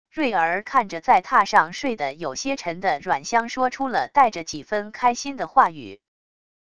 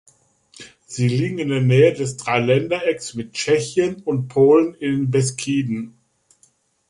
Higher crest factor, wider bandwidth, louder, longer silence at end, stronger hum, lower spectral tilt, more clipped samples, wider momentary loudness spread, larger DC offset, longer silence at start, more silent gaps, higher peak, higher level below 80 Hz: about the same, 22 dB vs 18 dB; about the same, 11 kHz vs 11.5 kHz; second, -22 LUFS vs -19 LUFS; second, 0.75 s vs 1 s; neither; second, -3 dB/octave vs -6 dB/octave; neither; about the same, 10 LU vs 12 LU; first, 0.4% vs under 0.1%; second, 0.15 s vs 0.6 s; neither; about the same, -2 dBFS vs -2 dBFS; about the same, -60 dBFS vs -58 dBFS